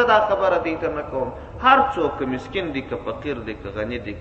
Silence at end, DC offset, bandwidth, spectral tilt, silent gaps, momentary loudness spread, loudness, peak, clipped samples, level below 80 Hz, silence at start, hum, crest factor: 0 s; under 0.1%; 8.2 kHz; -6.5 dB/octave; none; 13 LU; -22 LUFS; 0 dBFS; under 0.1%; -44 dBFS; 0 s; none; 22 dB